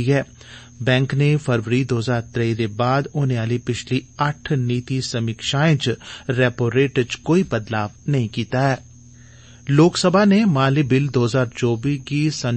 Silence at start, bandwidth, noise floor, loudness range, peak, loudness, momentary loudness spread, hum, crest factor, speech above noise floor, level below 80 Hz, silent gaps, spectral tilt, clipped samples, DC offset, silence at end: 0 s; 8.8 kHz; -44 dBFS; 4 LU; -2 dBFS; -20 LUFS; 8 LU; none; 16 dB; 25 dB; -50 dBFS; none; -6 dB/octave; under 0.1%; under 0.1%; 0 s